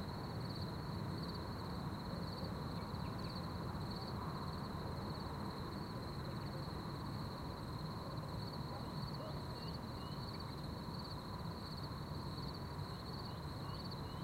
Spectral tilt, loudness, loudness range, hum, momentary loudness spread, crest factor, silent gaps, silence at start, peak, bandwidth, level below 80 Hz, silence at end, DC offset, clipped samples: -6.5 dB/octave; -46 LUFS; 2 LU; none; 2 LU; 14 dB; none; 0 s; -30 dBFS; 16 kHz; -56 dBFS; 0 s; under 0.1%; under 0.1%